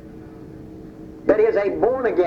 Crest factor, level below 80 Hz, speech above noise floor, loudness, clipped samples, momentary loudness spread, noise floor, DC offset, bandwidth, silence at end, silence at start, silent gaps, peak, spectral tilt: 18 dB; -48 dBFS; 21 dB; -19 LUFS; under 0.1%; 22 LU; -39 dBFS; under 0.1%; 6.4 kHz; 0 s; 0.05 s; none; -4 dBFS; -8 dB/octave